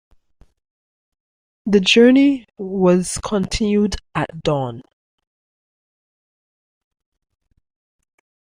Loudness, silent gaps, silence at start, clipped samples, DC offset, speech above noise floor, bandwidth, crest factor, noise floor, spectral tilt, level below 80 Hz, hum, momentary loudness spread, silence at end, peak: -17 LUFS; none; 1.65 s; under 0.1%; under 0.1%; over 74 dB; 15 kHz; 20 dB; under -90 dBFS; -5 dB/octave; -42 dBFS; none; 14 LU; 3.8 s; 0 dBFS